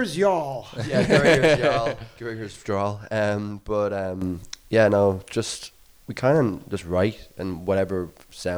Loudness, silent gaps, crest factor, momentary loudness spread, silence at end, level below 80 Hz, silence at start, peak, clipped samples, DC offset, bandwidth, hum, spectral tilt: -23 LUFS; none; 16 dB; 16 LU; 0 s; -48 dBFS; 0 s; -6 dBFS; under 0.1%; under 0.1%; over 20 kHz; none; -5.5 dB/octave